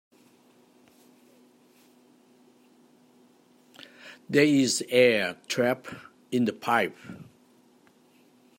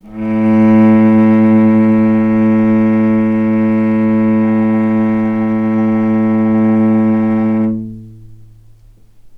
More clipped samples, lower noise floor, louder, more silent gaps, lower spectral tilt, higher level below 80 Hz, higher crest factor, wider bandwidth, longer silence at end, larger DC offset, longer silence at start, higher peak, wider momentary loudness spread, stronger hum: neither; first, -60 dBFS vs -42 dBFS; second, -25 LUFS vs -11 LUFS; neither; second, -4 dB/octave vs -10.5 dB/octave; second, -76 dBFS vs -46 dBFS; first, 24 dB vs 12 dB; first, 16 kHz vs 3.5 kHz; first, 1.35 s vs 0 s; neither; first, 4.05 s vs 0.05 s; second, -6 dBFS vs 0 dBFS; first, 25 LU vs 6 LU; neither